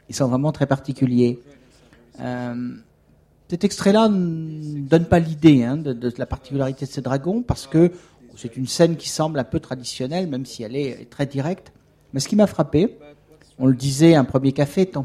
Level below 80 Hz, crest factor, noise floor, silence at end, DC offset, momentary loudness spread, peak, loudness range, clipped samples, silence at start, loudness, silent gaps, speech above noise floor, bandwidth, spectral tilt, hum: -48 dBFS; 20 dB; -56 dBFS; 0 s; under 0.1%; 14 LU; -2 dBFS; 5 LU; under 0.1%; 0.1 s; -20 LUFS; none; 36 dB; 14.5 kHz; -6.5 dB/octave; none